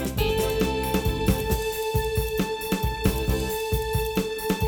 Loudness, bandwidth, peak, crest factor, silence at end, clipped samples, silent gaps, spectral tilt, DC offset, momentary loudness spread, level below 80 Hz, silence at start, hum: -26 LUFS; over 20 kHz; -8 dBFS; 16 dB; 0 s; under 0.1%; none; -5 dB/octave; under 0.1%; 3 LU; -32 dBFS; 0 s; none